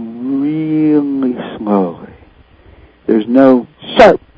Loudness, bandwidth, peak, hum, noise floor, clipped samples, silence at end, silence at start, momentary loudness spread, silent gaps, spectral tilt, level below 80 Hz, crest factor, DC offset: -12 LUFS; 8 kHz; 0 dBFS; none; -43 dBFS; 2%; 0.2 s; 0 s; 13 LU; none; -7.5 dB/octave; -46 dBFS; 12 dB; under 0.1%